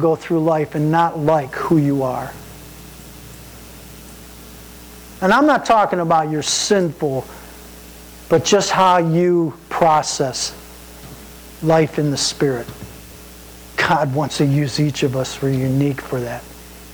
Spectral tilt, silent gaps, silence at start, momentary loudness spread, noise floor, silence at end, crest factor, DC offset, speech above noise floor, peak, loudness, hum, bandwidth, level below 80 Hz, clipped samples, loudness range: -5 dB/octave; none; 0 s; 23 LU; -39 dBFS; 0 s; 14 dB; under 0.1%; 22 dB; -6 dBFS; -17 LUFS; none; over 20 kHz; -46 dBFS; under 0.1%; 5 LU